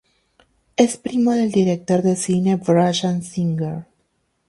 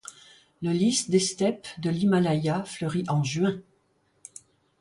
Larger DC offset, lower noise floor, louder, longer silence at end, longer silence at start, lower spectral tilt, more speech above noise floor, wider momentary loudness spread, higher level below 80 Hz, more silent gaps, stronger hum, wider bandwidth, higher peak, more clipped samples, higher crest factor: neither; about the same, -68 dBFS vs -68 dBFS; first, -19 LUFS vs -26 LUFS; second, 0.65 s vs 1.2 s; first, 0.8 s vs 0.05 s; about the same, -6 dB/octave vs -5 dB/octave; first, 50 dB vs 43 dB; second, 8 LU vs 19 LU; first, -58 dBFS vs -64 dBFS; neither; neither; about the same, 11.5 kHz vs 11.5 kHz; first, -2 dBFS vs -10 dBFS; neither; about the same, 18 dB vs 18 dB